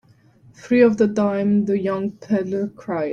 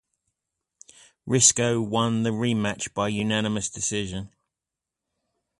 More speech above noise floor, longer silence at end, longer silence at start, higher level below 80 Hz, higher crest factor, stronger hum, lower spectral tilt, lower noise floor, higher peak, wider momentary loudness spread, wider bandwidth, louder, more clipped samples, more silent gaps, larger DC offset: second, 32 dB vs 63 dB; second, 0 s vs 1.3 s; second, 0.65 s vs 1.25 s; about the same, -60 dBFS vs -56 dBFS; about the same, 18 dB vs 22 dB; neither; first, -8 dB/octave vs -3.5 dB/octave; second, -52 dBFS vs -88 dBFS; about the same, -2 dBFS vs -4 dBFS; second, 10 LU vs 15 LU; second, 7.2 kHz vs 11.5 kHz; first, -20 LUFS vs -23 LUFS; neither; neither; neither